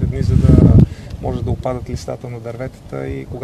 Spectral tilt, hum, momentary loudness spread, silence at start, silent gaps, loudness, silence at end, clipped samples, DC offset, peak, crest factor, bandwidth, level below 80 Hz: -9 dB/octave; none; 18 LU; 0 s; none; -15 LUFS; 0 s; 0.1%; 0.2%; 0 dBFS; 16 dB; 10 kHz; -24 dBFS